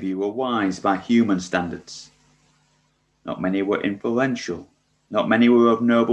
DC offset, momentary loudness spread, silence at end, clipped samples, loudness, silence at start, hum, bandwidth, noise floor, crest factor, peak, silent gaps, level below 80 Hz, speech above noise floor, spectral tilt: under 0.1%; 18 LU; 0 s; under 0.1%; -21 LUFS; 0 s; none; 8.4 kHz; -65 dBFS; 18 dB; -4 dBFS; none; -56 dBFS; 45 dB; -6 dB/octave